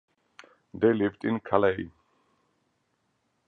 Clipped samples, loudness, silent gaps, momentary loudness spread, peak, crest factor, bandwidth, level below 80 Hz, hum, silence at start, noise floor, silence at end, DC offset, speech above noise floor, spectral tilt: under 0.1%; -26 LUFS; none; 16 LU; -6 dBFS; 24 dB; 6.6 kHz; -62 dBFS; none; 0.75 s; -74 dBFS; 1.6 s; under 0.1%; 49 dB; -8.5 dB/octave